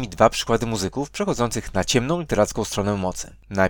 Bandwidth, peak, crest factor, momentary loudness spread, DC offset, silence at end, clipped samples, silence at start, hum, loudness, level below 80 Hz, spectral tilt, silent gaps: 19 kHz; 0 dBFS; 22 dB; 8 LU; under 0.1%; 0 s; under 0.1%; 0 s; none; -23 LUFS; -40 dBFS; -4.5 dB/octave; none